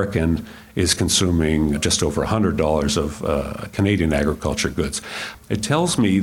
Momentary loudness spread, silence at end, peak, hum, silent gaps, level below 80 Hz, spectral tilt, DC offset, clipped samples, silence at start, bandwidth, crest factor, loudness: 9 LU; 0 s; -4 dBFS; none; none; -34 dBFS; -4.5 dB/octave; under 0.1%; under 0.1%; 0 s; 17 kHz; 16 dB; -20 LUFS